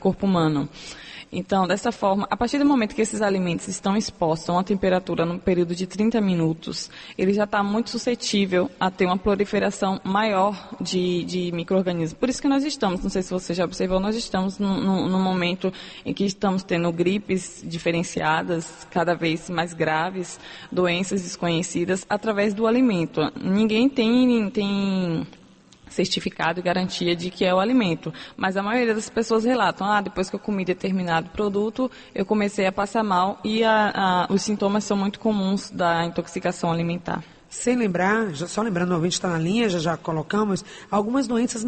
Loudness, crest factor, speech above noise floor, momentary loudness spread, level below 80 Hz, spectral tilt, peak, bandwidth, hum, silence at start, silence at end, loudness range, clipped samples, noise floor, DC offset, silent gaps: -23 LUFS; 16 dB; 27 dB; 7 LU; -50 dBFS; -5.5 dB/octave; -8 dBFS; 8.8 kHz; none; 0 s; 0 s; 3 LU; under 0.1%; -50 dBFS; under 0.1%; none